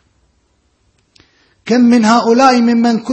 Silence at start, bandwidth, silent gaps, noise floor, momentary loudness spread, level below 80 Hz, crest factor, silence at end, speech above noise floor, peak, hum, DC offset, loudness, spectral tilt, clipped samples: 1.65 s; 8.6 kHz; none; -59 dBFS; 6 LU; -58 dBFS; 12 dB; 0 s; 49 dB; 0 dBFS; none; under 0.1%; -10 LUFS; -5 dB/octave; under 0.1%